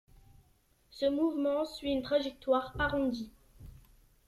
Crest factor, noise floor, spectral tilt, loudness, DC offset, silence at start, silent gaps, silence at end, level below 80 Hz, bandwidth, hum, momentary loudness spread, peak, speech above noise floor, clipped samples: 18 dB; -68 dBFS; -6 dB/octave; -32 LUFS; under 0.1%; 0.95 s; none; 0.55 s; -54 dBFS; 14 kHz; none; 5 LU; -16 dBFS; 37 dB; under 0.1%